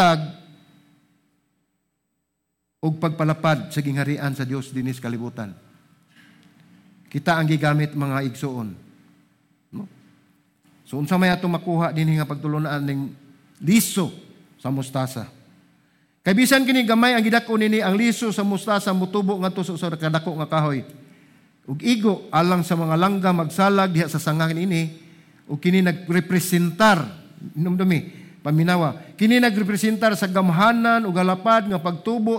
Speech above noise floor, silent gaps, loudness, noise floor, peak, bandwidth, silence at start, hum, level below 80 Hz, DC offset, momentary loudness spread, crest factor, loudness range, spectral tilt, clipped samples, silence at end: 56 dB; none; -21 LUFS; -76 dBFS; -6 dBFS; 17 kHz; 0 s; none; -62 dBFS; under 0.1%; 14 LU; 16 dB; 8 LU; -5.5 dB/octave; under 0.1%; 0 s